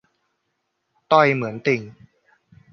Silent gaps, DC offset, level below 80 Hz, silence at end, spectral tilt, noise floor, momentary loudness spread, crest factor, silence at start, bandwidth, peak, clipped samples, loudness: none; under 0.1%; -68 dBFS; 0.8 s; -6.5 dB/octave; -75 dBFS; 7 LU; 22 dB; 1.1 s; 6.6 kHz; -2 dBFS; under 0.1%; -19 LUFS